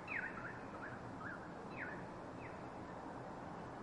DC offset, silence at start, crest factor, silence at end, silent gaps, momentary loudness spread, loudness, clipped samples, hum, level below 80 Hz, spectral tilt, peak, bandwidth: under 0.1%; 0 s; 18 dB; 0 s; none; 5 LU; -48 LUFS; under 0.1%; none; -68 dBFS; -6.5 dB/octave; -30 dBFS; 11 kHz